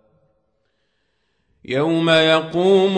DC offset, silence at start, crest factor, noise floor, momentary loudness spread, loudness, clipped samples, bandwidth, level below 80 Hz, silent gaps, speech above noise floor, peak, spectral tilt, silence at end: under 0.1%; 1.7 s; 16 dB; -69 dBFS; 8 LU; -16 LUFS; under 0.1%; 9.6 kHz; -62 dBFS; none; 54 dB; -4 dBFS; -5.5 dB/octave; 0 s